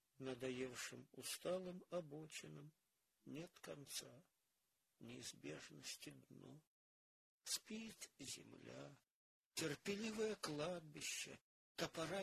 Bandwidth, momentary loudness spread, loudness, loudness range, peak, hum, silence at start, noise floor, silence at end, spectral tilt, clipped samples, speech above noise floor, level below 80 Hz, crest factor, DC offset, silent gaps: 15 kHz; 16 LU; -50 LUFS; 8 LU; -30 dBFS; none; 0.2 s; -89 dBFS; 0 s; -3 dB/octave; under 0.1%; 38 dB; -84 dBFS; 22 dB; under 0.1%; 6.67-7.41 s, 9.12-9.51 s, 11.41-11.75 s